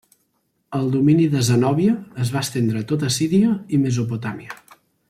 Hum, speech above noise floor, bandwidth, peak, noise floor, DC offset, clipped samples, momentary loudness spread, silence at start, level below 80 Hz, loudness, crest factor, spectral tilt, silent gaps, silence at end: none; 50 dB; 15.5 kHz; -6 dBFS; -69 dBFS; under 0.1%; under 0.1%; 12 LU; 0.7 s; -56 dBFS; -20 LUFS; 14 dB; -6 dB/octave; none; 0.55 s